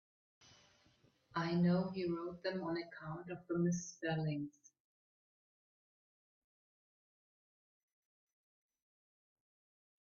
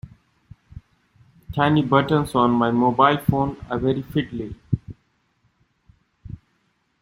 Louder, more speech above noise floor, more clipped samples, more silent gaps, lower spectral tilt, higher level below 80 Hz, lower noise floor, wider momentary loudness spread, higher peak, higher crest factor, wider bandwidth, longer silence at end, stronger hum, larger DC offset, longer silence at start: second, -40 LUFS vs -21 LUFS; second, 34 dB vs 48 dB; neither; neither; about the same, -6.5 dB/octave vs -7.5 dB/octave; second, -78 dBFS vs -48 dBFS; first, -73 dBFS vs -68 dBFS; second, 13 LU vs 16 LU; second, -24 dBFS vs -2 dBFS; about the same, 20 dB vs 22 dB; second, 7 kHz vs 16 kHz; first, 5.55 s vs 0.65 s; neither; neither; first, 1.35 s vs 0.05 s